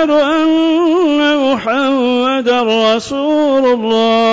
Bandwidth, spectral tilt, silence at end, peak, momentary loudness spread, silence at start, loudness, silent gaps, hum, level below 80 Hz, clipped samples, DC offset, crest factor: 8 kHz; -4.5 dB/octave; 0 s; -4 dBFS; 2 LU; 0 s; -12 LUFS; none; none; -54 dBFS; under 0.1%; under 0.1%; 8 dB